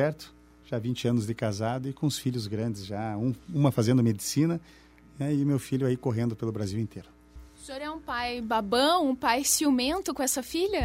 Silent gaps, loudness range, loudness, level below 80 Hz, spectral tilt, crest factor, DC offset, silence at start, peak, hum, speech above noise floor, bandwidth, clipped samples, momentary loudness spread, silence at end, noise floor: none; 5 LU; -28 LUFS; -56 dBFS; -5 dB/octave; 20 dB; under 0.1%; 0 s; -8 dBFS; none; 22 dB; 16 kHz; under 0.1%; 12 LU; 0 s; -50 dBFS